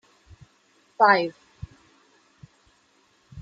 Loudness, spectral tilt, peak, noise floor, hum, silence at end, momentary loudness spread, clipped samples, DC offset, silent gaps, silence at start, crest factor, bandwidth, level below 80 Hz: -21 LUFS; -5.5 dB/octave; -4 dBFS; -63 dBFS; none; 0 s; 26 LU; under 0.1%; under 0.1%; none; 1 s; 24 dB; 7.8 kHz; -58 dBFS